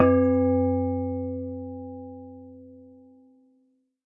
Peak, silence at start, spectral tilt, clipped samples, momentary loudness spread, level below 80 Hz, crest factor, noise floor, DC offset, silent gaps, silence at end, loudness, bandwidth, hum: -6 dBFS; 0 s; -12 dB/octave; under 0.1%; 24 LU; -68 dBFS; 22 dB; -67 dBFS; under 0.1%; none; 1.3 s; -25 LUFS; 3 kHz; none